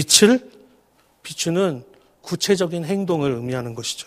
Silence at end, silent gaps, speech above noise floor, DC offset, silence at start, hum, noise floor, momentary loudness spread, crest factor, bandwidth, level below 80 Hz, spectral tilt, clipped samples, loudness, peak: 0.05 s; none; 39 dB; under 0.1%; 0 s; none; -59 dBFS; 20 LU; 22 dB; 15.5 kHz; -60 dBFS; -3.5 dB/octave; under 0.1%; -20 LUFS; 0 dBFS